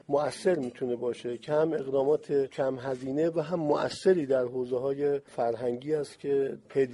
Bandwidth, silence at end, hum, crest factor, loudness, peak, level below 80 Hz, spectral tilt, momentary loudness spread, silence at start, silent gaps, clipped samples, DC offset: 11.5 kHz; 0 s; none; 16 dB; -29 LUFS; -14 dBFS; -70 dBFS; -6.5 dB/octave; 6 LU; 0.1 s; none; under 0.1%; under 0.1%